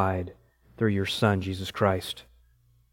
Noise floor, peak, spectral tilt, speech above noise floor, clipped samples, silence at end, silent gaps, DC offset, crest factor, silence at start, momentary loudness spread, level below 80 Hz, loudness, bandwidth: -63 dBFS; -8 dBFS; -6 dB/octave; 36 dB; under 0.1%; 0.7 s; none; under 0.1%; 22 dB; 0 s; 12 LU; -58 dBFS; -27 LUFS; 17 kHz